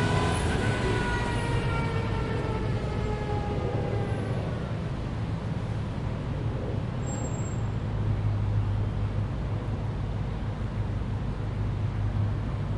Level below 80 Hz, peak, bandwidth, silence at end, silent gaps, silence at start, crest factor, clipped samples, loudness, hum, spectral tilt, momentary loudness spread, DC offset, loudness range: -36 dBFS; -14 dBFS; 11 kHz; 0 s; none; 0 s; 14 dB; under 0.1%; -30 LUFS; none; -6.5 dB/octave; 5 LU; under 0.1%; 3 LU